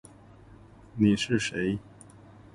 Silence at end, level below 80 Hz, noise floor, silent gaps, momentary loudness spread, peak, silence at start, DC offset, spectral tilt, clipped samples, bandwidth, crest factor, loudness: 0.75 s; -56 dBFS; -52 dBFS; none; 12 LU; -10 dBFS; 0.95 s; under 0.1%; -5.5 dB/octave; under 0.1%; 11.5 kHz; 20 dB; -27 LUFS